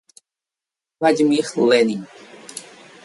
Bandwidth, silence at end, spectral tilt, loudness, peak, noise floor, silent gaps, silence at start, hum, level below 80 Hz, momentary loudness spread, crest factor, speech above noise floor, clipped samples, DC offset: 11.5 kHz; 0.45 s; -4.5 dB/octave; -18 LUFS; -4 dBFS; -88 dBFS; none; 1 s; none; -68 dBFS; 21 LU; 18 dB; 71 dB; under 0.1%; under 0.1%